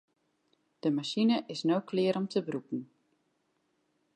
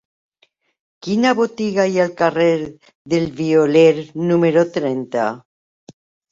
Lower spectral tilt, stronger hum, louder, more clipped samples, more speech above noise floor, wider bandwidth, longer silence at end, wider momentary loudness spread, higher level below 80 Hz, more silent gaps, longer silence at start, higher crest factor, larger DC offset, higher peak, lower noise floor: about the same, -6 dB/octave vs -6.5 dB/octave; neither; second, -31 LUFS vs -17 LUFS; neither; about the same, 46 dB vs 45 dB; first, 10 kHz vs 7.8 kHz; first, 1.3 s vs 0.95 s; about the same, 9 LU vs 9 LU; second, -84 dBFS vs -60 dBFS; second, none vs 2.95-3.05 s; second, 0.85 s vs 1.05 s; about the same, 16 dB vs 16 dB; neither; second, -16 dBFS vs -2 dBFS; first, -76 dBFS vs -62 dBFS